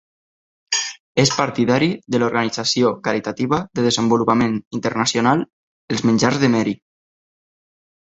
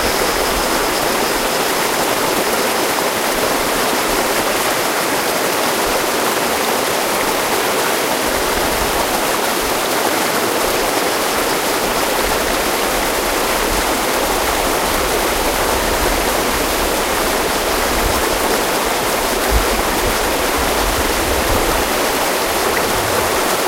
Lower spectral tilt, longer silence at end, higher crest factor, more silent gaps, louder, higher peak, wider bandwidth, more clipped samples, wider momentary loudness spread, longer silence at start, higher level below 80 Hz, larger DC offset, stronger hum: first, -4.5 dB/octave vs -2 dB/octave; first, 1.25 s vs 0 s; about the same, 18 dB vs 14 dB; first, 1.00-1.15 s, 4.67-4.71 s, 5.53-5.88 s vs none; second, -19 LUFS vs -16 LUFS; about the same, -2 dBFS vs -2 dBFS; second, 8.2 kHz vs 16 kHz; neither; first, 6 LU vs 1 LU; first, 0.7 s vs 0 s; second, -54 dBFS vs -30 dBFS; neither; neither